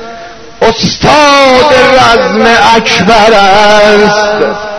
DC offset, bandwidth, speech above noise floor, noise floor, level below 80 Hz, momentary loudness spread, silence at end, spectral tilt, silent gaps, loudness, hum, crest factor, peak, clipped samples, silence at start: under 0.1%; 11 kHz; 22 dB; -26 dBFS; -30 dBFS; 6 LU; 0 s; -3.5 dB/octave; none; -4 LUFS; none; 6 dB; 0 dBFS; 5%; 0 s